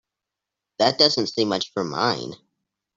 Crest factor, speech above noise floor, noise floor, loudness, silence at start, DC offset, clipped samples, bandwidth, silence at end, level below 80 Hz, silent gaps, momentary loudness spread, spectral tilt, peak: 22 dB; 63 dB; -86 dBFS; -21 LUFS; 0.8 s; under 0.1%; under 0.1%; 7.8 kHz; 0.6 s; -64 dBFS; none; 11 LU; -4 dB/octave; -2 dBFS